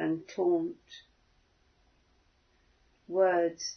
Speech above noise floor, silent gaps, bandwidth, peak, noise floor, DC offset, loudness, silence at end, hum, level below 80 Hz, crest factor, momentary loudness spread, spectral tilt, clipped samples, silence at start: 39 dB; none; 6.6 kHz; -16 dBFS; -69 dBFS; under 0.1%; -30 LUFS; 0 s; none; -72 dBFS; 18 dB; 24 LU; -4.5 dB/octave; under 0.1%; 0 s